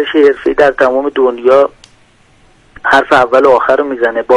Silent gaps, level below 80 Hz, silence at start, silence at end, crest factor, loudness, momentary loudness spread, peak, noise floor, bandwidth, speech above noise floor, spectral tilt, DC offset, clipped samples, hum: none; -44 dBFS; 0 s; 0 s; 10 dB; -10 LUFS; 6 LU; 0 dBFS; -47 dBFS; 11 kHz; 38 dB; -5 dB/octave; under 0.1%; 0.3%; none